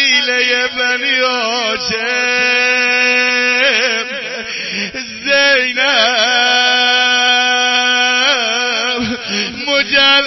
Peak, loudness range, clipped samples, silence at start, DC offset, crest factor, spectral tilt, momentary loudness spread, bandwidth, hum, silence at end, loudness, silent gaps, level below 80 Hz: 0 dBFS; 2 LU; under 0.1%; 0 s; under 0.1%; 14 dB; -0.5 dB/octave; 8 LU; 6.2 kHz; none; 0 s; -12 LUFS; none; -52 dBFS